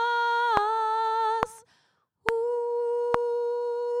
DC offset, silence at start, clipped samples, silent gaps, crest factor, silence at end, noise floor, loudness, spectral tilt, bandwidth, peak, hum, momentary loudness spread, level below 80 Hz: under 0.1%; 0 s; under 0.1%; none; 24 dB; 0 s; -69 dBFS; -27 LUFS; -3.5 dB/octave; 11.5 kHz; -2 dBFS; none; 6 LU; -58 dBFS